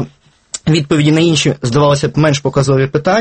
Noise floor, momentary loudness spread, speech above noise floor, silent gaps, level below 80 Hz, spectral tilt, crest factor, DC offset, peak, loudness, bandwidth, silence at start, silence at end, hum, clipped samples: -40 dBFS; 6 LU; 29 dB; none; -42 dBFS; -5.5 dB/octave; 12 dB; under 0.1%; 0 dBFS; -12 LUFS; 8.8 kHz; 0 s; 0 s; none; under 0.1%